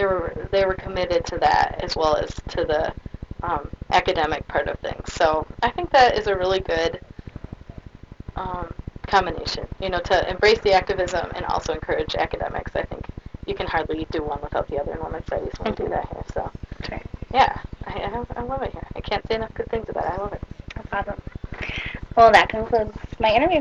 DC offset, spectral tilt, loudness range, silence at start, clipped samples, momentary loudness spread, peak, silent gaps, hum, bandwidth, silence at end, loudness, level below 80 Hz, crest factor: under 0.1%; -5 dB/octave; 7 LU; 0 s; under 0.1%; 17 LU; 0 dBFS; none; none; 9 kHz; 0 s; -23 LUFS; -38 dBFS; 22 dB